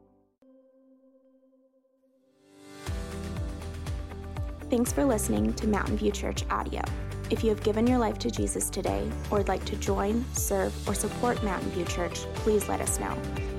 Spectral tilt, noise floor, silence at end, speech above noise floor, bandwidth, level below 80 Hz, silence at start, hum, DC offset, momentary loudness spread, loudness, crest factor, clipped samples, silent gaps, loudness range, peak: -5 dB/octave; -67 dBFS; 0 s; 39 dB; 16 kHz; -38 dBFS; 2.55 s; none; under 0.1%; 11 LU; -29 LUFS; 16 dB; under 0.1%; none; 12 LU; -14 dBFS